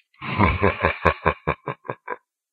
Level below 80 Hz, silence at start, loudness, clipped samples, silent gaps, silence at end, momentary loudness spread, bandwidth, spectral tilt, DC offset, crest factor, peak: -36 dBFS; 0.2 s; -22 LUFS; under 0.1%; none; 0.35 s; 15 LU; 7 kHz; -8.5 dB/octave; under 0.1%; 24 dB; 0 dBFS